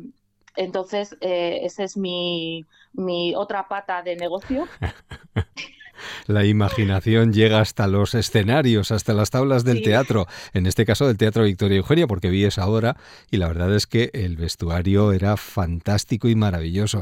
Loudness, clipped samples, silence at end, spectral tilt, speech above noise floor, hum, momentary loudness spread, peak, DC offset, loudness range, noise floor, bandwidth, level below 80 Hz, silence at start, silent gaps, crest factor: -21 LUFS; under 0.1%; 0 s; -6 dB/octave; 30 dB; none; 11 LU; -4 dBFS; under 0.1%; 8 LU; -50 dBFS; 16 kHz; -44 dBFS; 0 s; none; 16 dB